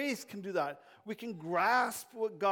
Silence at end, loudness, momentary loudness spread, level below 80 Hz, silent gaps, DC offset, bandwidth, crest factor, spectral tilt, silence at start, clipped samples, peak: 0 s; -34 LUFS; 14 LU; -86 dBFS; none; under 0.1%; 19 kHz; 16 dB; -4 dB/octave; 0 s; under 0.1%; -18 dBFS